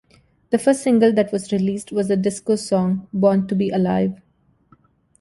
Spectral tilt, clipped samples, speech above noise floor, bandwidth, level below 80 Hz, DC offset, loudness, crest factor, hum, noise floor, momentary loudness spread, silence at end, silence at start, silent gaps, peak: -6.5 dB/octave; under 0.1%; 38 dB; 11.5 kHz; -56 dBFS; under 0.1%; -19 LUFS; 16 dB; none; -57 dBFS; 7 LU; 1.05 s; 0.5 s; none; -4 dBFS